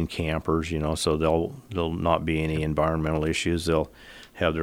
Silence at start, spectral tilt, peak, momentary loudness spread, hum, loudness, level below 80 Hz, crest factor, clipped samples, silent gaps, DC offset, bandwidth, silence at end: 0 s; -5.5 dB/octave; -6 dBFS; 6 LU; none; -26 LUFS; -42 dBFS; 20 dB; under 0.1%; none; under 0.1%; 16 kHz; 0 s